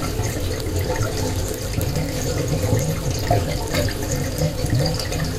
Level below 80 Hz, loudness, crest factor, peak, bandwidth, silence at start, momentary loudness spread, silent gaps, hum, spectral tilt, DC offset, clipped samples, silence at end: -30 dBFS; -23 LUFS; 18 dB; -4 dBFS; 16 kHz; 0 s; 3 LU; none; none; -5 dB/octave; under 0.1%; under 0.1%; 0 s